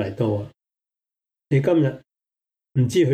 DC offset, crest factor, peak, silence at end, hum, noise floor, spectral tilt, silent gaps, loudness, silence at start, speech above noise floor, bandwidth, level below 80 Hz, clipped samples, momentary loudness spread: under 0.1%; 14 dB; -8 dBFS; 0 s; none; -87 dBFS; -7.5 dB/octave; none; -22 LUFS; 0 s; 67 dB; 12.5 kHz; -60 dBFS; under 0.1%; 14 LU